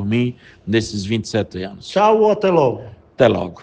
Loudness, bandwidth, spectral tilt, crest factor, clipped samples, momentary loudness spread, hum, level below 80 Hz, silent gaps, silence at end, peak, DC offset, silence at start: -18 LUFS; 9.6 kHz; -6 dB/octave; 18 dB; under 0.1%; 13 LU; none; -52 dBFS; none; 0 s; 0 dBFS; under 0.1%; 0 s